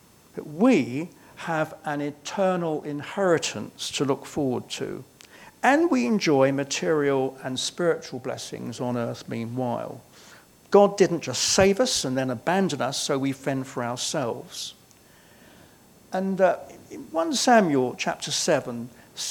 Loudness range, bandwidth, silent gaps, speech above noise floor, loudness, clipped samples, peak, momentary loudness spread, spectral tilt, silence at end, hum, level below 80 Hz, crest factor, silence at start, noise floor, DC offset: 7 LU; 19 kHz; none; 30 dB; -25 LUFS; under 0.1%; -4 dBFS; 15 LU; -4 dB/octave; 0 s; none; -62 dBFS; 22 dB; 0.35 s; -54 dBFS; under 0.1%